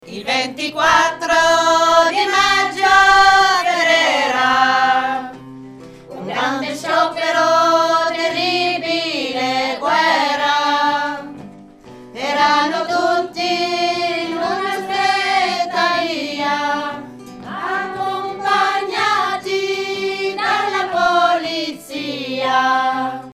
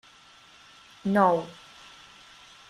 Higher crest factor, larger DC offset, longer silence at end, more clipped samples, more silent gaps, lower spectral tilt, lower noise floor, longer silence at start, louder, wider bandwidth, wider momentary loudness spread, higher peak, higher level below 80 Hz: second, 16 dB vs 22 dB; neither; second, 0 s vs 1.2 s; neither; neither; second, -2 dB/octave vs -6.5 dB/octave; second, -39 dBFS vs -54 dBFS; second, 0.05 s vs 1.05 s; first, -16 LUFS vs -25 LUFS; first, 15.5 kHz vs 12.5 kHz; second, 11 LU vs 27 LU; first, 0 dBFS vs -8 dBFS; first, -52 dBFS vs -68 dBFS